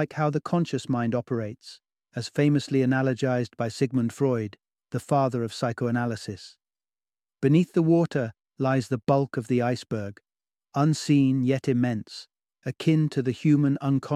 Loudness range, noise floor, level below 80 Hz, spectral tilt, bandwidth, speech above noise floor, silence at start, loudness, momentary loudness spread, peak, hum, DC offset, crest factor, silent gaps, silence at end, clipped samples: 3 LU; under -90 dBFS; -66 dBFS; -7 dB/octave; 12.5 kHz; over 65 dB; 0 s; -25 LUFS; 13 LU; -8 dBFS; none; under 0.1%; 16 dB; none; 0 s; under 0.1%